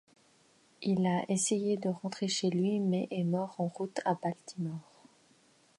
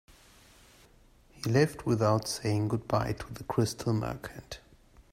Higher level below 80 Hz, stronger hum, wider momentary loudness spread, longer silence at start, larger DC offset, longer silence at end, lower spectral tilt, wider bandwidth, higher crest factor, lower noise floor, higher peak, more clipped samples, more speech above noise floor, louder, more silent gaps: second, -78 dBFS vs -54 dBFS; neither; second, 9 LU vs 15 LU; second, 0.8 s vs 1.35 s; neither; first, 0.95 s vs 0.1 s; about the same, -5 dB/octave vs -6 dB/octave; second, 11.5 kHz vs 16 kHz; about the same, 16 dB vs 20 dB; first, -66 dBFS vs -60 dBFS; second, -16 dBFS vs -12 dBFS; neither; first, 34 dB vs 30 dB; second, -33 LUFS vs -30 LUFS; neither